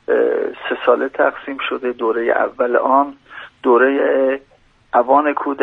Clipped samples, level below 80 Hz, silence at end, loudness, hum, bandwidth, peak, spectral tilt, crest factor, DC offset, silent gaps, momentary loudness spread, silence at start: under 0.1%; -60 dBFS; 0 s; -17 LUFS; none; 4.2 kHz; 0 dBFS; -6.5 dB/octave; 16 dB; under 0.1%; none; 9 LU; 0.1 s